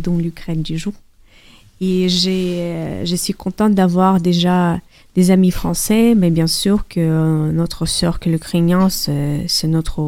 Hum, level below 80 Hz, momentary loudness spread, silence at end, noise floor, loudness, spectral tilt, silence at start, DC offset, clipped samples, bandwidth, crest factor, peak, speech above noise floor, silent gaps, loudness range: none; -34 dBFS; 9 LU; 0 s; -46 dBFS; -16 LUFS; -5.5 dB/octave; 0 s; under 0.1%; under 0.1%; 16.5 kHz; 16 dB; 0 dBFS; 30 dB; none; 5 LU